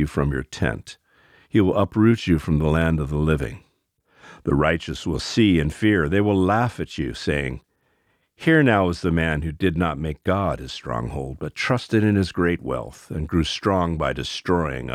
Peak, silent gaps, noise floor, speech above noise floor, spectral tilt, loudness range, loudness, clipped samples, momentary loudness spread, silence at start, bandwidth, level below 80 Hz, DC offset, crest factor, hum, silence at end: -4 dBFS; none; -67 dBFS; 46 dB; -6.5 dB/octave; 2 LU; -22 LUFS; under 0.1%; 11 LU; 0 s; 14 kHz; -36 dBFS; under 0.1%; 18 dB; none; 0 s